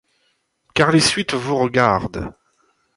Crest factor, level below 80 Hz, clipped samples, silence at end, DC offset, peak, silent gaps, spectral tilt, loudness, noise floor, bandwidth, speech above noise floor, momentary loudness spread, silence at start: 18 dB; -46 dBFS; under 0.1%; 0.65 s; under 0.1%; -2 dBFS; none; -4 dB/octave; -17 LUFS; -67 dBFS; 11.5 kHz; 49 dB; 15 LU; 0.75 s